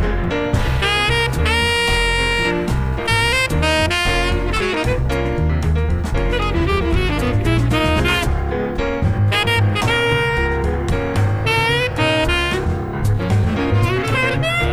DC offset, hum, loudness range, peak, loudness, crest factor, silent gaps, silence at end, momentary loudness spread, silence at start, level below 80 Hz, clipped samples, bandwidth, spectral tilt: under 0.1%; none; 2 LU; -2 dBFS; -17 LUFS; 14 dB; none; 0 s; 5 LU; 0 s; -24 dBFS; under 0.1%; over 20 kHz; -5 dB/octave